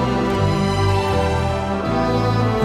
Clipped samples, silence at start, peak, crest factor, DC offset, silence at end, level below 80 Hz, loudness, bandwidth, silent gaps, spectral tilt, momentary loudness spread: under 0.1%; 0 s; -6 dBFS; 12 dB; under 0.1%; 0 s; -32 dBFS; -19 LUFS; 13 kHz; none; -6.5 dB/octave; 3 LU